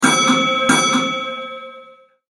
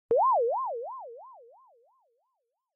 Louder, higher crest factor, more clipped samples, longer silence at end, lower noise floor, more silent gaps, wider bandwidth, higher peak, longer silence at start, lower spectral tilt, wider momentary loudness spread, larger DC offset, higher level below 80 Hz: first, -16 LUFS vs -28 LUFS; about the same, 18 dB vs 14 dB; neither; second, 0.4 s vs 1.4 s; second, -45 dBFS vs -81 dBFS; neither; first, 13.5 kHz vs 2.2 kHz; first, 0 dBFS vs -18 dBFS; about the same, 0 s vs 0.1 s; about the same, -2 dB/octave vs -1.5 dB/octave; second, 18 LU vs 22 LU; neither; first, -60 dBFS vs -84 dBFS